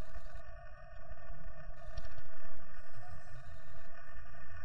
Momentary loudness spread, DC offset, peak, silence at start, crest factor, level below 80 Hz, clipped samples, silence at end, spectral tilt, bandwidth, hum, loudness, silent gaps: 5 LU; 3%; -20 dBFS; 0 s; 10 dB; -52 dBFS; under 0.1%; 0 s; -6 dB/octave; 9.4 kHz; none; -54 LUFS; none